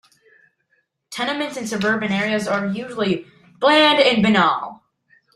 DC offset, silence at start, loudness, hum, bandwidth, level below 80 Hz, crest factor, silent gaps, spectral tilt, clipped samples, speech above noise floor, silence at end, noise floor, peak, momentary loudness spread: under 0.1%; 1.1 s; -18 LUFS; none; 13 kHz; -60 dBFS; 18 dB; none; -4.5 dB/octave; under 0.1%; 49 dB; 0.6 s; -68 dBFS; -2 dBFS; 12 LU